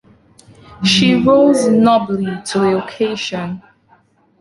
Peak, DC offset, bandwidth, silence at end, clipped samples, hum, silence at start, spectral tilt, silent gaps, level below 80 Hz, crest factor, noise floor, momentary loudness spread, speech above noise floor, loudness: -2 dBFS; under 0.1%; 11.5 kHz; 0.8 s; under 0.1%; none; 0.7 s; -5 dB/octave; none; -50 dBFS; 14 dB; -53 dBFS; 11 LU; 40 dB; -14 LUFS